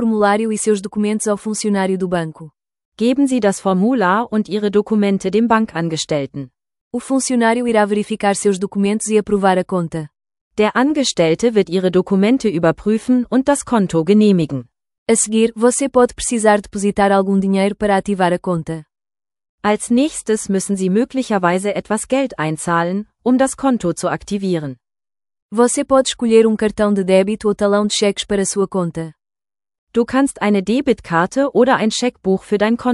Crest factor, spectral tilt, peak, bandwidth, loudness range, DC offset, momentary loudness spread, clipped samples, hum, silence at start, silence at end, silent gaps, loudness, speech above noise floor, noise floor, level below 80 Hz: 16 dB; -5 dB/octave; 0 dBFS; 12 kHz; 3 LU; under 0.1%; 7 LU; under 0.1%; none; 0 s; 0 s; 2.85-2.92 s, 6.81-6.91 s, 10.41-10.51 s, 14.98-15.06 s, 19.49-19.58 s, 25.42-25.49 s, 29.78-29.87 s; -16 LUFS; over 74 dB; under -90 dBFS; -48 dBFS